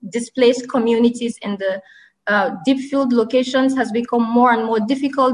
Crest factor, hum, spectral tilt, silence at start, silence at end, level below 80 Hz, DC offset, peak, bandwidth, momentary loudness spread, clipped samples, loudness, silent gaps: 14 dB; none; -5 dB/octave; 0.05 s; 0 s; -62 dBFS; under 0.1%; -4 dBFS; 10.5 kHz; 9 LU; under 0.1%; -18 LUFS; none